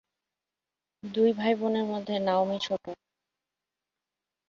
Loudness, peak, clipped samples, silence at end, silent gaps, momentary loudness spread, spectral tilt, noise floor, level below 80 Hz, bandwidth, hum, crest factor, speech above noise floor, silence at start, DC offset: -28 LUFS; -12 dBFS; under 0.1%; 1.55 s; none; 17 LU; -6 dB/octave; -90 dBFS; -74 dBFS; 7.4 kHz; 50 Hz at -55 dBFS; 18 dB; 62 dB; 1.05 s; under 0.1%